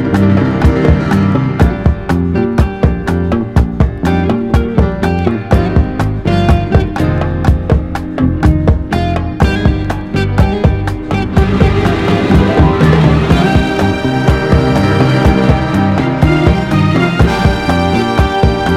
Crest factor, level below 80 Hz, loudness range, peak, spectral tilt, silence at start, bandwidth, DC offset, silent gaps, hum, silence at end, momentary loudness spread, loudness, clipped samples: 10 dB; -18 dBFS; 3 LU; 0 dBFS; -7.5 dB/octave; 0 s; 13 kHz; under 0.1%; none; none; 0 s; 5 LU; -12 LUFS; 0.3%